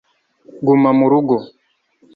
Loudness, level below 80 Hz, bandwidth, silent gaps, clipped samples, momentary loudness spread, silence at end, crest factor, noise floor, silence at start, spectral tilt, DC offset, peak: -15 LUFS; -60 dBFS; 4.8 kHz; none; under 0.1%; 8 LU; 0.7 s; 14 dB; -57 dBFS; 0.55 s; -11 dB/octave; under 0.1%; -2 dBFS